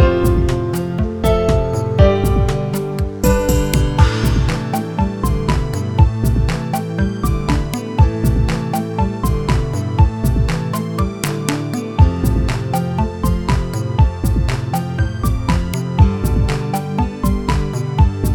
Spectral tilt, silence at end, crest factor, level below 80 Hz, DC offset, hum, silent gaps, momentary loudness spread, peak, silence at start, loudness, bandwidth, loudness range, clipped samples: -6.5 dB/octave; 0 s; 16 dB; -20 dBFS; under 0.1%; none; none; 6 LU; 0 dBFS; 0 s; -17 LUFS; 18 kHz; 2 LU; under 0.1%